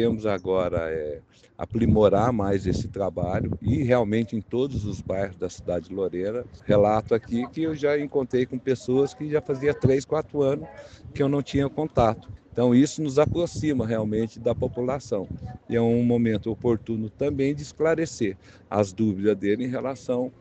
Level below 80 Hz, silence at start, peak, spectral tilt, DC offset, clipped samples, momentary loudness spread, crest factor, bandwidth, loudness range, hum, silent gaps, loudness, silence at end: -46 dBFS; 0 s; -4 dBFS; -7.5 dB/octave; under 0.1%; under 0.1%; 9 LU; 20 dB; 8.6 kHz; 2 LU; none; none; -25 LUFS; 0.1 s